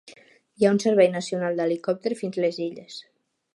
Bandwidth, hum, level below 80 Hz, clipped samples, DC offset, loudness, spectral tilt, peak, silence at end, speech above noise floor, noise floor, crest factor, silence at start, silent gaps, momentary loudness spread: 11.5 kHz; none; -74 dBFS; under 0.1%; under 0.1%; -24 LUFS; -5.5 dB/octave; -6 dBFS; 0.55 s; 30 dB; -53 dBFS; 18 dB; 0.05 s; none; 16 LU